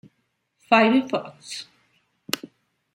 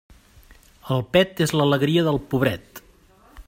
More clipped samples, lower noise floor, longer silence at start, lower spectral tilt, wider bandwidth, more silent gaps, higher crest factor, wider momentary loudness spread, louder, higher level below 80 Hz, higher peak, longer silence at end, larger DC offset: neither; first, -73 dBFS vs -53 dBFS; second, 0.7 s vs 0.85 s; second, -4 dB/octave vs -6 dB/octave; about the same, 16 kHz vs 16 kHz; neither; about the same, 24 dB vs 20 dB; first, 18 LU vs 7 LU; about the same, -22 LUFS vs -21 LUFS; second, -74 dBFS vs -50 dBFS; about the same, -2 dBFS vs -4 dBFS; first, 0.6 s vs 0.05 s; neither